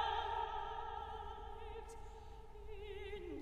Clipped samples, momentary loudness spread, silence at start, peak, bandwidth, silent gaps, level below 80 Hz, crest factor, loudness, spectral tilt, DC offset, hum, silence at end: under 0.1%; 15 LU; 0 s; -28 dBFS; 13.5 kHz; none; -54 dBFS; 18 dB; -47 LUFS; -5 dB/octave; under 0.1%; none; 0 s